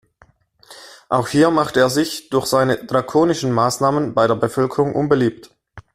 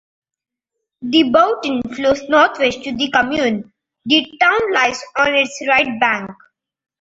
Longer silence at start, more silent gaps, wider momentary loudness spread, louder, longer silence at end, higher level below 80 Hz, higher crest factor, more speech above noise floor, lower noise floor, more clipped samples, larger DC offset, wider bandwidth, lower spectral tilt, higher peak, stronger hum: second, 0.7 s vs 1 s; neither; second, 5 LU vs 8 LU; about the same, -18 LUFS vs -16 LUFS; second, 0.15 s vs 0.7 s; about the same, -52 dBFS vs -52 dBFS; about the same, 16 dB vs 16 dB; second, 38 dB vs 65 dB; second, -55 dBFS vs -80 dBFS; neither; neither; first, 15 kHz vs 8 kHz; first, -5.5 dB/octave vs -3.5 dB/octave; about the same, -2 dBFS vs 0 dBFS; neither